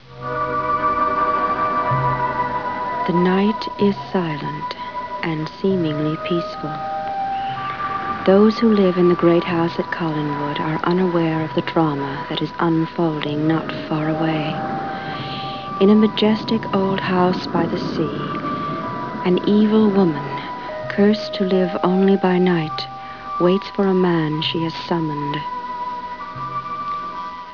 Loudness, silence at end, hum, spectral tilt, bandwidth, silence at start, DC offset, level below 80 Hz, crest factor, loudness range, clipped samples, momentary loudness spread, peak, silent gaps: -20 LUFS; 0 s; none; -8 dB/octave; 5.4 kHz; 0.05 s; 0.3%; -52 dBFS; 18 dB; 5 LU; under 0.1%; 11 LU; -2 dBFS; none